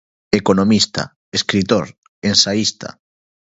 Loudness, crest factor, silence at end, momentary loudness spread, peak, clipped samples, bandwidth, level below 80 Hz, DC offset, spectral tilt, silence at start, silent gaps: -16 LUFS; 18 dB; 0.7 s; 14 LU; 0 dBFS; under 0.1%; 8 kHz; -48 dBFS; under 0.1%; -4 dB/octave; 0.3 s; 1.16-1.32 s, 1.98-2.22 s